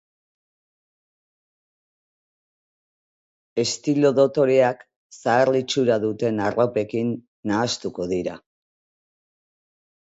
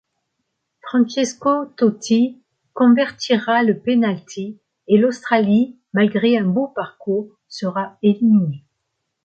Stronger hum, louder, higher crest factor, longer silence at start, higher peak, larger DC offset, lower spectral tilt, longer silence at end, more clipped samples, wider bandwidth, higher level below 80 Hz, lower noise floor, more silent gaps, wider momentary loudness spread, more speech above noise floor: neither; second, -22 LUFS vs -18 LUFS; about the same, 20 dB vs 16 dB; first, 3.55 s vs 0.85 s; about the same, -4 dBFS vs -2 dBFS; neither; about the same, -5 dB/octave vs -6 dB/octave; first, 1.75 s vs 0.65 s; neither; about the same, 8 kHz vs 8.4 kHz; about the same, -62 dBFS vs -66 dBFS; first, under -90 dBFS vs -75 dBFS; first, 4.96-5.10 s, 7.28-7.43 s vs none; about the same, 10 LU vs 12 LU; first, over 69 dB vs 58 dB